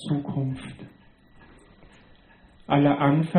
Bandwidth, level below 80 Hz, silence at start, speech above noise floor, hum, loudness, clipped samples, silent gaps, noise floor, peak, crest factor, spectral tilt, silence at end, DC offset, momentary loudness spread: 9.6 kHz; -56 dBFS; 0 s; 32 dB; none; -24 LUFS; under 0.1%; none; -54 dBFS; -8 dBFS; 18 dB; -8.5 dB/octave; 0 s; under 0.1%; 24 LU